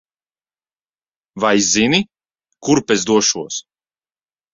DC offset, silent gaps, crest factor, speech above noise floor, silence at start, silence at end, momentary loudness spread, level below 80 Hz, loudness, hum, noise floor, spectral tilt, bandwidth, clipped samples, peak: under 0.1%; none; 18 dB; over 74 dB; 1.35 s; 0.95 s; 14 LU; -54 dBFS; -15 LUFS; none; under -90 dBFS; -3 dB/octave; 7.8 kHz; under 0.1%; -2 dBFS